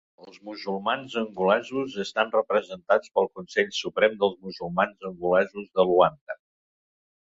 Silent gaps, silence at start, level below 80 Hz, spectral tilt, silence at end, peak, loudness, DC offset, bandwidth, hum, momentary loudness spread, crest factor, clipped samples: 6.21-6.27 s; 0.25 s; -66 dBFS; -5 dB/octave; 1.05 s; -4 dBFS; -25 LUFS; under 0.1%; 7.8 kHz; none; 13 LU; 22 dB; under 0.1%